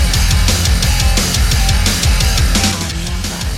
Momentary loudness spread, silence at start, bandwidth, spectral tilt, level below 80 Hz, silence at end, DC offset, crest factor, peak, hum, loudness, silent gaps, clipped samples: 7 LU; 0 s; 16.5 kHz; -3 dB/octave; -16 dBFS; 0 s; under 0.1%; 12 dB; -2 dBFS; none; -14 LUFS; none; under 0.1%